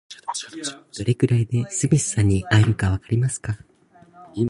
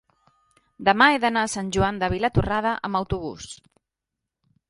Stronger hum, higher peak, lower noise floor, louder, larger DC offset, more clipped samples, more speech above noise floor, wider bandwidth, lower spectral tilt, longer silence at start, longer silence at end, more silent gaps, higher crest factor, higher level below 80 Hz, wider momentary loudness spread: neither; about the same, -4 dBFS vs -2 dBFS; second, -52 dBFS vs -85 dBFS; about the same, -22 LUFS vs -22 LUFS; neither; neither; second, 31 dB vs 62 dB; about the same, 11.5 kHz vs 11.5 kHz; about the same, -5.5 dB/octave vs -4.5 dB/octave; second, 0.1 s vs 0.8 s; second, 0 s vs 1.15 s; neither; about the same, 18 dB vs 22 dB; about the same, -40 dBFS vs -42 dBFS; second, 13 LU vs 17 LU